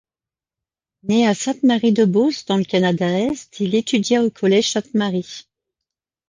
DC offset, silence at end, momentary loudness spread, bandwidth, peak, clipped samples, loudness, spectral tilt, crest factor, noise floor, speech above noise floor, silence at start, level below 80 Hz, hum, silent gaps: under 0.1%; 0.9 s; 8 LU; 10 kHz; -4 dBFS; under 0.1%; -18 LUFS; -5 dB/octave; 14 dB; under -90 dBFS; over 72 dB; 1.05 s; -60 dBFS; none; none